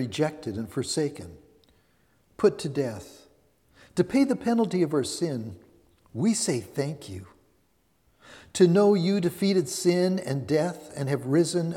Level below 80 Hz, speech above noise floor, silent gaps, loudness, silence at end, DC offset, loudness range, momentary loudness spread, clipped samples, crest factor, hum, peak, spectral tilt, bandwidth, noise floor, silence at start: -64 dBFS; 43 dB; none; -26 LUFS; 0 s; under 0.1%; 7 LU; 14 LU; under 0.1%; 20 dB; none; -6 dBFS; -5.5 dB/octave; 16.5 kHz; -68 dBFS; 0 s